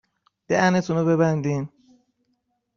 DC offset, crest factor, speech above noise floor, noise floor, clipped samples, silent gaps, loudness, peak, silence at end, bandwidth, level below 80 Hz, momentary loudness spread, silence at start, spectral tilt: under 0.1%; 18 dB; 52 dB; -73 dBFS; under 0.1%; none; -22 LUFS; -6 dBFS; 1.1 s; 7.2 kHz; -60 dBFS; 9 LU; 0.5 s; -6.5 dB/octave